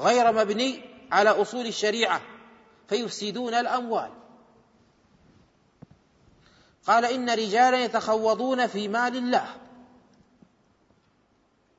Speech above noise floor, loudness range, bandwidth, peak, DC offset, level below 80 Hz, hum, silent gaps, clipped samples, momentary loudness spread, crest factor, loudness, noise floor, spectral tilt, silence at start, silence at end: 42 dB; 8 LU; 8 kHz; -8 dBFS; under 0.1%; -72 dBFS; none; none; under 0.1%; 10 LU; 20 dB; -25 LUFS; -66 dBFS; -3.5 dB/octave; 0 s; 2.15 s